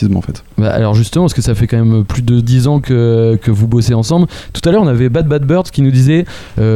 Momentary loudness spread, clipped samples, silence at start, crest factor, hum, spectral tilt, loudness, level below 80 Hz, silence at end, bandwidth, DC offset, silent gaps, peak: 5 LU; under 0.1%; 0 s; 10 dB; none; -7.5 dB/octave; -12 LUFS; -30 dBFS; 0 s; 13 kHz; under 0.1%; none; 0 dBFS